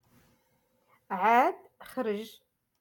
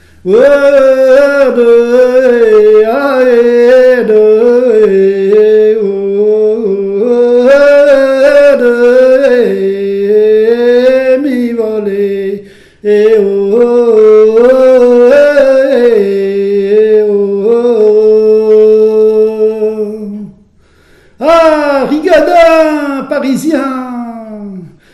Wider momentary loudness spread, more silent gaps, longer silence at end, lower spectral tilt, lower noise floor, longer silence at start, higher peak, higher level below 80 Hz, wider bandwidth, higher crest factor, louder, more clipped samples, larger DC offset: first, 20 LU vs 9 LU; neither; first, 0.5 s vs 0.25 s; about the same, -5 dB/octave vs -6 dB/octave; first, -72 dBFS vs -44 dBFS; first, 1.1 s vs 0.25 s; second, -12 dBFS vs 0 dBFS; second, -78 dBFS vs -44 dBFS; first, 17.5 kHz vs 12 kHz; first, 20 dB vs 6 dB; second, -28 LUFS vs -7 LUFS; second, under 0.1% vs 2%; neither